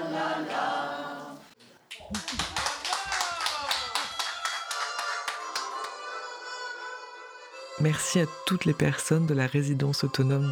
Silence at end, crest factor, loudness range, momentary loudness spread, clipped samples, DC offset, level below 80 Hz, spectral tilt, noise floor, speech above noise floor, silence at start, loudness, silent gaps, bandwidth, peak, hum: 0 s; 18 dB; 6 LU; 16 LU; under 0.1%; under 0.1%; -60 dBFS; -4.5 dB/octave; -55 dBFS; 29 dB; 0 s; -29 LUFS; none; 19.5 kHz; -12 dBFS; none